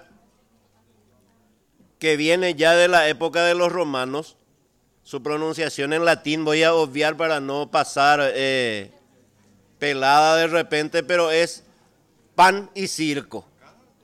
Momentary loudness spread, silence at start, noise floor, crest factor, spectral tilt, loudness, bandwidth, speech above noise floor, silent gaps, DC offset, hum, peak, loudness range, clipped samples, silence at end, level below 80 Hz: 11 LU; 2 s; -63 dBFS; 16 dB; -3.5 dB/octave; -20 LUFS; 15.5 kHz; 44 dB; none; under 0.1%; none; -6 dBFS; 3 LU; under 0.1%; 0.65 s; -66 dBFS